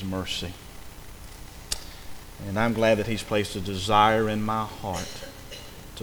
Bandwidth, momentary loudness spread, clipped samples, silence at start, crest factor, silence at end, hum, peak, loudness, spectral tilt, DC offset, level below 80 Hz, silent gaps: over 20 kHz; 23 LU; under 0.1%; 0 s; 22 dB; 0 s; none; -6 dBFS; -26 LUFS; -4.5 dB/octave; under 0.1%; -46 dBFS; none